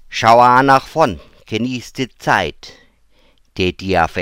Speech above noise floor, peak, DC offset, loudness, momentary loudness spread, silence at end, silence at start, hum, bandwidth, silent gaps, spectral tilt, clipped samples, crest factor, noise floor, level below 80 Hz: 38 dB; 0 dBFS; under 0.1%; -15 LUFS; 16 LU; 0 s; 0.1 s; none; 16.5 kHz; none; -5 dB/octave; under 0.1%; 16 dB; -52 dBFS; -42 dBFS